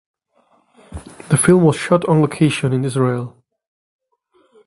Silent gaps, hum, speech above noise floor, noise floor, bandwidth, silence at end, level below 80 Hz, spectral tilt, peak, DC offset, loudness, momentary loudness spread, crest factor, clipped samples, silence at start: none; none; 45 dB; -60 dBFS; 12 kHz; 1.4 s; -48 dBFS; -6 dB/octave; 0 dBFS; under 0.1%; -16 LUFS; 23 LU; 18 dB; under 0.1%; 0.9 s